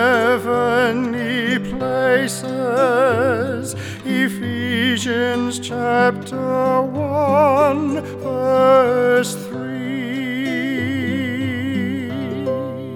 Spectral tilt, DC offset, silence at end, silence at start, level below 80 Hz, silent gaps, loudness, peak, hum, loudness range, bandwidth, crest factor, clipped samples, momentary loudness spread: -5 dB/octave; under 0.1%; 0 s; 0 s; -54 dBFS; none; -18 LUFS; -2 dBFS; none; 4 LU; 18.5 kHz; 16 dB; under 0.1%; 10 LU